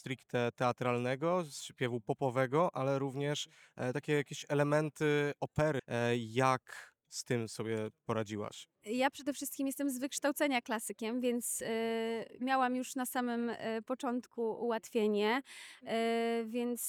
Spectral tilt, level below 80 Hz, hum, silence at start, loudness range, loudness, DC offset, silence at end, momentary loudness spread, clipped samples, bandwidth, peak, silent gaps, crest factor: -5 dB/octave; -72 dBFS; none; 0.05 s; 3 LU; -35 LUFS; under 0.1%; 0 s; 7 LU; under 0.1%; 19.5 kHz; -14 dBFS; none; 20 dB